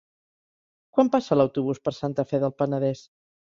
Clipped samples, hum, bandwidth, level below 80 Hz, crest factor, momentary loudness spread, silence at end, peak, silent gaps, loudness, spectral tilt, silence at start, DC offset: under 0.1%; none; 7.4 kHz; -64 dBFS; 20 dB; 7 LU; 0.45 s; -6 dBFS; none; -25 LUFS; -8 dB/octave; 0.95 s; under 0.1%